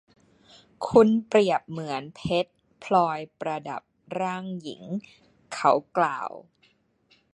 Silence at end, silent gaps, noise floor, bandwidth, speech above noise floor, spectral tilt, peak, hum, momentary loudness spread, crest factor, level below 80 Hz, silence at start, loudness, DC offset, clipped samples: 0.95 s; none; -65 dBFS; 11 kHz; 40 dB; -6 dB/octave; -4 dBFS; none; 17 LU; 24 dB; -62 dBFS; 0.8 s; -26 LUFS; under 0.1%; under 0.1%